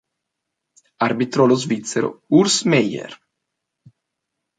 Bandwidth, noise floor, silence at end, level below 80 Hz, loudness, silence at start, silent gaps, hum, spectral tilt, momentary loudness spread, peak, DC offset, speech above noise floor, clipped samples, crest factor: 9.6 kHz; -80 dBFS; 1.45 s; -64 dBFS; -18 LUFS; 1 s; none; none; -4.5 dB/octave; 9 LU; -2 dBFS; under 0.1%; 62 dB; under 0.1%; 18 dB